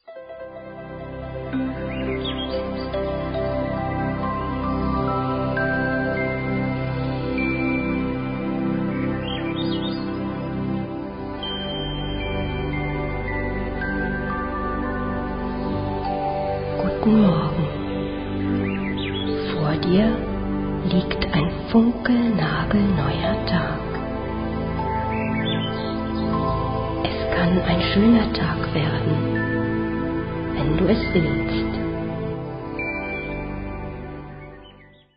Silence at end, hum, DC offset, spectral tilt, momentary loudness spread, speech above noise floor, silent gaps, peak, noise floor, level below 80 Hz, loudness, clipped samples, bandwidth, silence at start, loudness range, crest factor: 0.3 s; none; under 0.1%; -11 dB/octave; 9 LU; 30 dB; none; -6 dBFS; -48 dBFS; -36 dBFS; -23 LUFS; under 0.1%; 5.4 kHz; 0.05 s; 6 LU; 18 dB